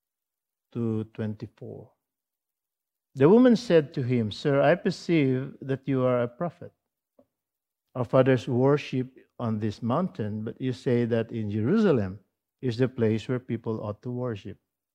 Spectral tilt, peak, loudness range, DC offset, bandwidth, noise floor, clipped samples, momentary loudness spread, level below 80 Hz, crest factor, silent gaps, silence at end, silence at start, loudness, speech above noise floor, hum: -8 dB/octave; -6 dBFS; 5 LU; under 0.1%; 9.4 kHz; -89 dBFS; under 0.1%; 14 LU; -68 dBFS; 20 dB; none; 0.4 s; 0.75 s; -26 LUFS; 64 dB; none